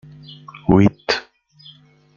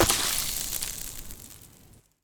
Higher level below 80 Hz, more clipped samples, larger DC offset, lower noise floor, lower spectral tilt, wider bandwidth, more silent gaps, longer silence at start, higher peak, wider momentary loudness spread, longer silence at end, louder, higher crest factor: about the same, -46 dBFS vs -44 dBFS; neither; neither; second, -48 dBFS vs -56 dBFS; first, -7 dB/octave vs -1.5 dB/octave; second, 7.4 kHz vs over 20 kHz; neither; first, 0.55 s vs 0 s; about the same, -2 dBFS vs -4 dBFS; first, 25 LU vs 21 LU; first, 0.95 s vs 0.55 s; first, -18 LUFS vs -27 LUFS; second, 18 dB vs 26 dB